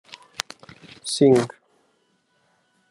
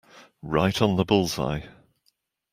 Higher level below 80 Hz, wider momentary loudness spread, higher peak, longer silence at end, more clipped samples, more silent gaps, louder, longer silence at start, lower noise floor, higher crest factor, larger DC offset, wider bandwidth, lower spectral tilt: second, -70 dBFS vs -50 dBFS; first, 25 LU vs 11 LU; first, 0 dBFS vs -4 dBFS; first, 1.45 s vs 0.85 s; neither; neither; first, -21 LUFS vs -24 LUFS; first, 1.05 s vs 0.15 s; second, -67 dBFS vs -71 dBFS; about the same, 24 dB vs 22 dB; neither; second, 12 kHz vs 16 kHz; about the same, -5 dB/octave vs -5.5 dB/octave